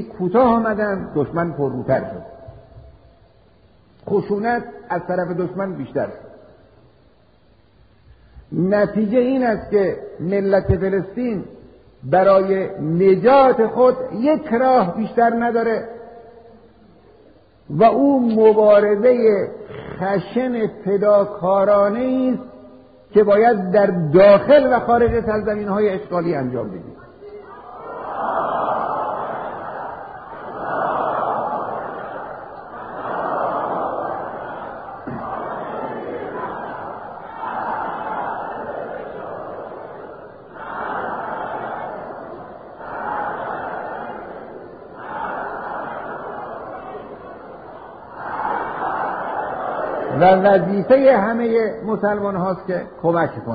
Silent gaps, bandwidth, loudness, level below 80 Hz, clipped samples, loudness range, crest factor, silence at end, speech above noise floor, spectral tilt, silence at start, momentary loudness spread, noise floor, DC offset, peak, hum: none; 5 kHz; -19 LUFS; -48 dBFS; under 0.1%; 13 LU; 18 dB; 0 s; 38 dB; -6 dB/octave; 0 s; 20 LU; -54 dBFS; 0.1%; -2 dBFS; none